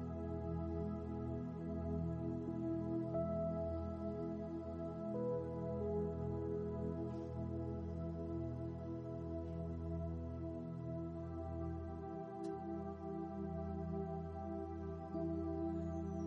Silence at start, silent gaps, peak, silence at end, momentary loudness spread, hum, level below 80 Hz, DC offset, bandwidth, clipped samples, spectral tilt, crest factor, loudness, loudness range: 0 s; none; -30 dBFS; 0 s; 5 LU; none; -54 dBFS; under 0.1%; 7 kHz; under 0.1%; -10.5 dB/octave; 14 dB; -44 LUFS; 3 LU